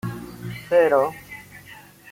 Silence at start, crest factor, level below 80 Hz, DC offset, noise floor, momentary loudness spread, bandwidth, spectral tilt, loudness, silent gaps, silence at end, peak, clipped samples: 0.05 s; 18 dB; -56 dBFS; under 0.1%; -45 dBFS; 24 LU; 16.5 kHz; -6.5 dB/octave; -20 LUFS; none; 0.35 s; -6 dBFS; under 0.1%